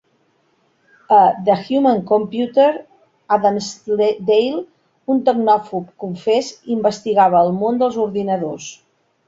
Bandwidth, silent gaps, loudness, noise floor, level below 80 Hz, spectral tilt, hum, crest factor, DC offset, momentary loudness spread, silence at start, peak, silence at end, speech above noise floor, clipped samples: 7.8 kHz; none; -17 LUFS; -62 dBFS; -62 dBFS; -6 dB/octave; none; 16 dB; under 0.1%; 13 LU; 1.1 s; -2 dBFS; 0.55 s; 45 dB; under 0.1%